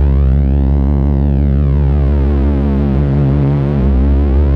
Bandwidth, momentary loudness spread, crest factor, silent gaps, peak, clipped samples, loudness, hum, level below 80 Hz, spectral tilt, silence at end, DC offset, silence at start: 3.8 kHz; 1 LU; 8 dB; none; -2 dBFS; under 0.1%; -13 LUFS; none; -14 dBFS; -11.5 dB/octave; 0 s; under 0.1%; 0 s